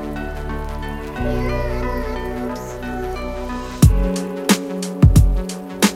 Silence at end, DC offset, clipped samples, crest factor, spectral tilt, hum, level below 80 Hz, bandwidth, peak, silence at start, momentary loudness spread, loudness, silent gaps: 0 s; under 0.1%; under 0.1%; 18 dB; -5.5 dB/octave; none; -24 dBFS; 16.5 kHz; 0 dBFS; 0 s; 13 LU; -20 LUFS; none